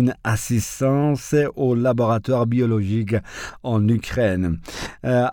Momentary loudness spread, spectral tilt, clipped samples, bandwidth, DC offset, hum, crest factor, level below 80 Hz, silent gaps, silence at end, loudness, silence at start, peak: 7 LU; -6.5 dB/octave; under 0.1%; 18.5 kHz; under 0.1%; none; 12 dB; -44 dBFS; none; 0 s; -21 LUFS; 0 s; -8 dBFS